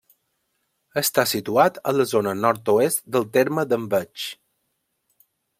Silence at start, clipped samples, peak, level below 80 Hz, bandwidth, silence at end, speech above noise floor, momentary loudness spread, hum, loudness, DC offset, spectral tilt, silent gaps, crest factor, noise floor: 0.95 s; under 0.1%; -2 dBFS; -66 dBFS; 16.5 kHz; 1.25 s; 53 dB; 8 LU; none; -21 LUFS; under 0.1%; -4 dB/octave; none; 20 dB; -74 dBFS